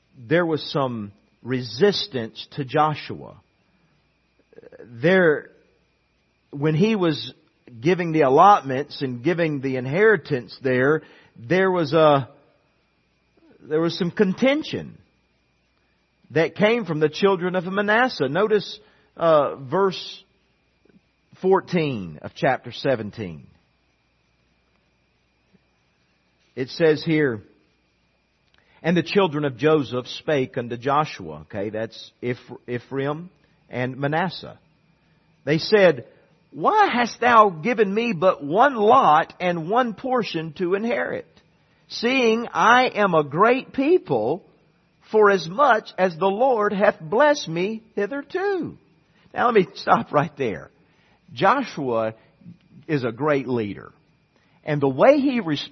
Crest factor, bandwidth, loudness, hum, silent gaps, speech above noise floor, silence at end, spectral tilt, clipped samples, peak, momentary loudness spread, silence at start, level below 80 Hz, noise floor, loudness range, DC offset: 20 dB; 6.4 kHz; -21 LUFS; none; none; 45 dB; 0.05 s; -6.5 dB/octave; under 0.1%; -2 dBFS; 15 LU; 0.2 s; -64 dBFS; -66 dBFS; 7 LU; under 0.1%